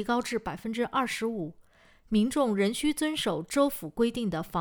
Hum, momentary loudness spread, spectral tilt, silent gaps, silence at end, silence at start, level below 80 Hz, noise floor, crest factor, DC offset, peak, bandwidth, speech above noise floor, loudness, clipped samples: none; 7 LU; -4.5 dB/octave; none; 0 s; 0 s; -54 dBFS; -59 dBFS; 18 dB; under 0.1%; -12 dBFS; over 20 kHz; 31 dB; -29 LUFS; under 0.1%